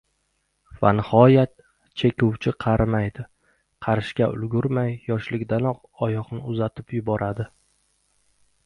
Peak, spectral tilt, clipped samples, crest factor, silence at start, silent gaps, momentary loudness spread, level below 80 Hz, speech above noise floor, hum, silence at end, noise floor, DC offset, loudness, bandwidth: -2 dBFS; -9 dB/octave; under 0.1%; 22 dB; 0.75 s; none; 13 LU; -46 dBFS; 50 dB; none; 1.2 s; -71 dBFS; under 0.1%; -23 LUFS; 10 kHz